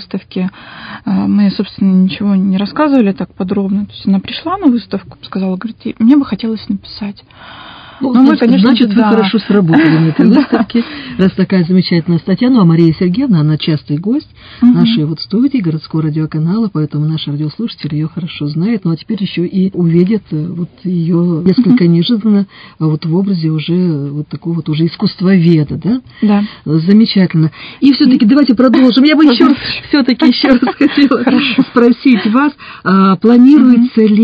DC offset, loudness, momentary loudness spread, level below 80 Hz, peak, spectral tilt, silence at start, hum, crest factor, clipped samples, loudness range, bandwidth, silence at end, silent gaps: under 0.1%; -11 LUFS; 11 LU; -46 dBFS; 0 dBFS; -9.5 dB/octave; 0 s; none; 10 dB; 0.6%; 6 LU; 5.2 kHz; 0 s; none